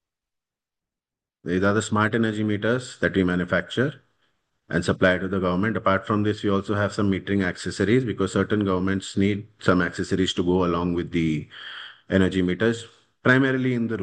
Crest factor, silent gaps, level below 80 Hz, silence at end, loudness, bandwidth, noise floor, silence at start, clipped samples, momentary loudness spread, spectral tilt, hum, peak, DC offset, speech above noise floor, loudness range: 20 dB; none; -58 dBFS; 0 s; -23 LUFS; 10 kHz; -89 dBFS; 1.45 s; under 0.1%; 5 LU; -6 dB/octave; none; -4 dBFS; under 0.1%; 67 dB; 1 LU